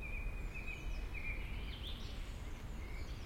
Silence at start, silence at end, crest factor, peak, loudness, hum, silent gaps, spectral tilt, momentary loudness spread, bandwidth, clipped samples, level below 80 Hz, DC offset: 0 s; 0 s; 12 dB; -30 dBFS; -46 LUFS; none; none; -5 dB/octave; 5 LU; 16.5 kHz; under 0.1%; -44 dBFS; under 0.1%